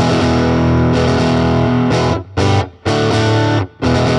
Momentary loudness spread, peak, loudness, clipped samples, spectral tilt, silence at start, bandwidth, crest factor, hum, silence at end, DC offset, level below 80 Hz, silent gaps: 4 LU; 0 dBFS; -14 LUFS; under 0.1%; -6.5 dB/octave; 0 s; 10.5 kHz; 12 dB; none; 0 s; under 0.1%; -30 dBFS; none